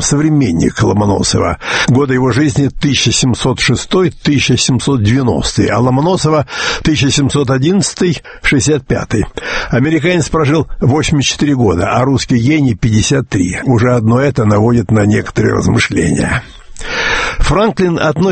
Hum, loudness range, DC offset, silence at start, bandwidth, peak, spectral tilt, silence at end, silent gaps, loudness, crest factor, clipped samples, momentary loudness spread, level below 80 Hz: none; 1 LU; under 0.1%; 0 s; 8.8 kHz; 0 dBFS; -5 dB/octave; 0 s; none; -12 LUFS; 12 dB; under 0.1%; 4 LU; -28 dBFS